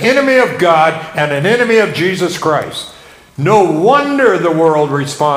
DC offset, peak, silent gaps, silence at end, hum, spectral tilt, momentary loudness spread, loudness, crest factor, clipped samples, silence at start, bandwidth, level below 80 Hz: under 0.1%; 0 dBFS; none; 0 s; none; -5.5 dB/octave; 7 LU; -12 LUFS; 12 dB; 0.3%; 0 s; 16 kHz; -52 dBFS